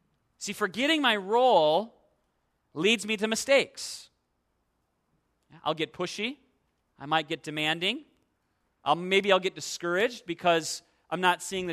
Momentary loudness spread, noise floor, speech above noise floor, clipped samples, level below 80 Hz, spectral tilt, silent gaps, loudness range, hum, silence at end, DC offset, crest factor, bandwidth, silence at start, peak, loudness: 14 LU; -76 dBFS; 49 dB; under 0.1%; -72 dBFS; -3 dB/octave; none; 8 LU; none; 0 s; under 0.1%; 22 dB; 14 kHz; 0.4 s; -8 dBFS; -27 LUFS